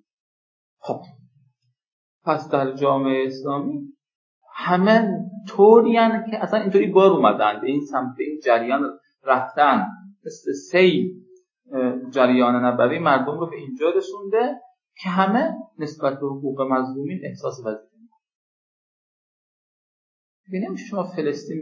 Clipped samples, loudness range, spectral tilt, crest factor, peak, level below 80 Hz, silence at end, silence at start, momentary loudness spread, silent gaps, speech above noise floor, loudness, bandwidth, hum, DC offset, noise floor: under 0.1%; 13 LU; -7 dB/octave; 20 dB; -2 dBFS; -80 dBFS; 0 s; 0.85 s; 15 LU; 1.92-2.21 s, 4.15-4.41 s, 18.35-20.44 s; 47 dB; -21 LUFS; 7.4 kHz; none; under 0.1%; -67 dBFS